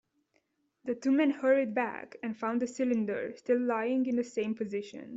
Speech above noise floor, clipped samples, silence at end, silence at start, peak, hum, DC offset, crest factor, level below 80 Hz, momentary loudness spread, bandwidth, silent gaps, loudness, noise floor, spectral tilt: 45 dB; under 0.1%; 0 s; 0.85 s; -16 dBFS; none; under 0.1%; 16 dB; -78 dBFS; 11 LU; 7.8 kHz; none; -31 LUFS; -75 dBFS; -6 dB/octave